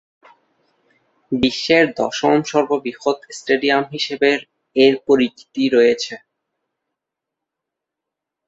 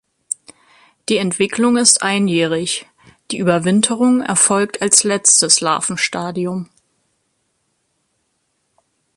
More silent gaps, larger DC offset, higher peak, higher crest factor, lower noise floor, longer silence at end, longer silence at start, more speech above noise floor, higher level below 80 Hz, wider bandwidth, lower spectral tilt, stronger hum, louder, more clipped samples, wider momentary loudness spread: neither; neither; about the same, -2 dBFS vs 0 dBFS; about the same, 18 dB vs 18 dB; first, -83 dBFS vs -68 dBFS; second, 2.3 s vs 2.55 s; first, 1.3 s vs 1.1 s; first, 66 dB vs 52 dB; about the same, -56 dBFS vs -60 dBFS; second, 8 kHz vs 12 kHz; first, -4.5 dB/octave vs -2.5 dB/octave; neither; second, -18 LUFS vs -15 LUFS; neither; second, 9 LU vs 16 LU